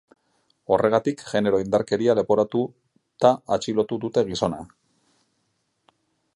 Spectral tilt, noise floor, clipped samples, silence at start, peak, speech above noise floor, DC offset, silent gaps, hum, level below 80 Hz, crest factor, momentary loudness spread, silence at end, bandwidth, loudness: -6 dB/octave; -72 dBFS; under 0.1%; 0.7 s; -4 dBFS; 51 dB; under 0.1%; none; none; -58 dBFS; 22 dB; 7 LU; 1.7 s; 11.5 kHz; -23 LUFS